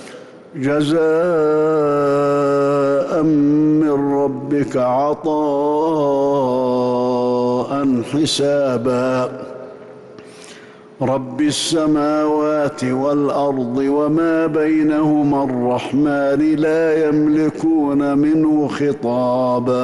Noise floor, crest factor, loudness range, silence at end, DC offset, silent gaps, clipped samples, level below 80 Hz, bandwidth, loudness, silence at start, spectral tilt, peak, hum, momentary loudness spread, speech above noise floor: -40 dBFS; 8 dB; 4 LU; 0 s; under 0.1%; none; under 0.1%; -54 dBFS; 12 kHz; -17 LUFS; 0 s; -6 dB/octave; -8 dBFS; none; 4 LU; 24 dB